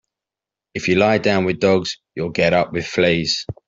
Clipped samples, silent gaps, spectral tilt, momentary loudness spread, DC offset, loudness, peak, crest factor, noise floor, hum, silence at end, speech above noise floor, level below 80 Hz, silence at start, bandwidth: under 0.1%; none; -5 dB/octave; 10 LU; under 0.1%; -18 LUFS; -2 dBFS; 16 dB; -88 dBFS; none; 0.15 s; 69 dB; -52 dBFS; 0.75 s; 7.8 kHz